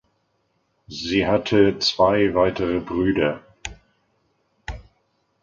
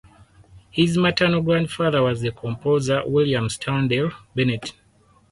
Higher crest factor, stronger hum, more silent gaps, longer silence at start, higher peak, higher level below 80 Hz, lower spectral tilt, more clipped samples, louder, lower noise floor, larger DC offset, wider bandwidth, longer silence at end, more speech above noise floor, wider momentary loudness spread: about the same, 20 dB vs 16 dB; neither; neither; first, 0.9 s vs 0.55 s; about the same, -4 dBFS vs -6 dBFS; first, -44 dBFS vs -50 dBFS; about the same, -5.5 dB/octave vs -6 dB/octave; neither; about the same, -20 LUFS vs -21 LUFS; first, -69 dBFS vs -57 dBFS; neither; second, 7.6 kHz vs 11.5 kHz; about the same, 0.6 s vs 0.6 s; first, 49 dB vs 36 dB; first, 20 LU vs 9 LU